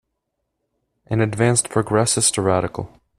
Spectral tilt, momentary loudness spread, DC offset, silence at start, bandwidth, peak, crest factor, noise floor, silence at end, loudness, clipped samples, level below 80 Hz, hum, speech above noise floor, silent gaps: -4 dB/octave; 9 LU; under 0.1%; 1.1 s; 14 kHz; -2 dBFS; 20 dB; -76 dBFS; 0.3 s; -19 LUFS; under 0.1%; -50 dBFS; none; 57 dB; none